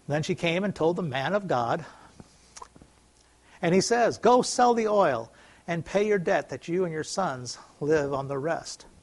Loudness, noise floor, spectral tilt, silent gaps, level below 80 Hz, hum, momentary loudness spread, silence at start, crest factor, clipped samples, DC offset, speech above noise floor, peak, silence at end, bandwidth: -26 LUFS; -60 dBFS; -5 dB/octave; none; -60 dBFS; none; 13 LU; 0.1 s; 20 dB; under 0.1%; under 0.1%; 34 dB; -8 dBFS; 0.25 s; 11.5 kHz